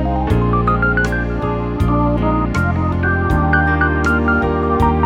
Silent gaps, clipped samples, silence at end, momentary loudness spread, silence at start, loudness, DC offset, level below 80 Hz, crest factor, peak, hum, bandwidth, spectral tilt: none; under 0.1%; 0 s; 4 LU; 0 s; -16 LUFS; under 0.1%; -24 dBFS; 14 dB; -2 dBFS; none; 10.5 kHz; -8 dB/octave